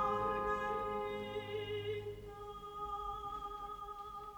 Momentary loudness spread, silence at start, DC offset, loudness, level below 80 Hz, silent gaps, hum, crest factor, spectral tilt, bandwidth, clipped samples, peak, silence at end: 11 LU; 0 s; under 0.1%; -41 LUFS; -58 dBFS; none; none; 16 dB; -5.5 dB/octave; over 20 kHz; under 0.1%; -24 dBFS; 0 s